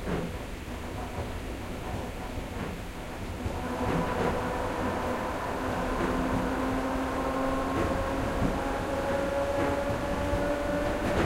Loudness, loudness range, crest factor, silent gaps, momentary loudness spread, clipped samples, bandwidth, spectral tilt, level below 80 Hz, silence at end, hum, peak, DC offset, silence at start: -31 LUFS; 7 LU; 16 dB; none; 8 LU; under 0.1%; 16 kHz; -6 dB/octave; -40 dBFS; 0 s; none; -14 dBFS; under 0.1%; 0 s